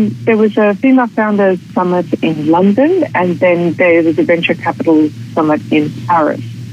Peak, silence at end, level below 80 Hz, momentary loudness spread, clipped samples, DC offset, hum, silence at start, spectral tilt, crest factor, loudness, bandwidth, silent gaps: 0 dBFS; 0 s; -60 dBFS; 5 LU; under 0.1%; under 0.1%; none; 0 s; -8 dB/octave; 12 dB; -12 LUFS; 9.2 kHz; none